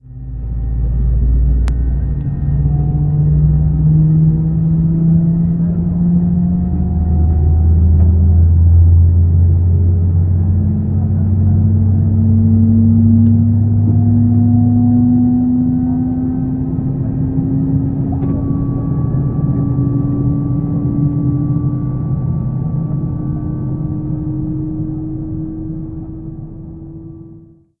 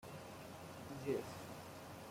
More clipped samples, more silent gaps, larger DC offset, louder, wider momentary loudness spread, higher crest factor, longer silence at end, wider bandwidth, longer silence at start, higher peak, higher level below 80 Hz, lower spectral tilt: neither; neither; neither; first, -14 LUFS vs -48 LUFS; about the same, 11 LU vs 10 LU; second, 12 dB vs 20 dB; first, 0.4 s vs 0 s; second, 2 kHz vs 16.5 kHz; about the same, 0.1 s vs 0 s; first, 0 dBFS vs -28 dBFS; first, -20 dBFS vs -72 dBFS; first, -13.5 dB/octave vs -5.5 dB/octave